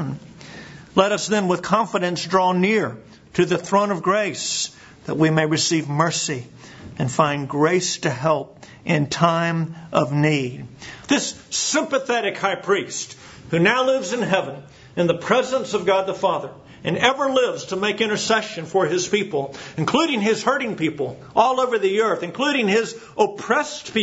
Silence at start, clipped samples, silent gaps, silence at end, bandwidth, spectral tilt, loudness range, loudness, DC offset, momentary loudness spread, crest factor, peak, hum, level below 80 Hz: 0 s; under 0.1%; none; 0 s; 8 kHz; -4 dB/octave; 1 LU; -21 LUFS; under 0.1%; 12 LU; 22 dB; 0 dBFS; none; -60 dBFS